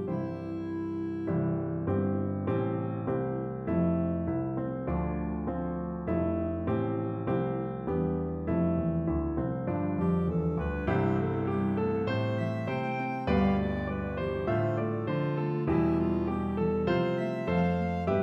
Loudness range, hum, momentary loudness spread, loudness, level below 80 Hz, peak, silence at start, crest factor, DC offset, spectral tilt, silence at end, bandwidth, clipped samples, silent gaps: 2 LU; none; 6 LU; -30 LUFS; -46 dBFS; -14 dBFS; 0 s; 14 dB; under 0.1%; -10 dB/octave; 0 s; 5.8 kHz; under 0.1%; none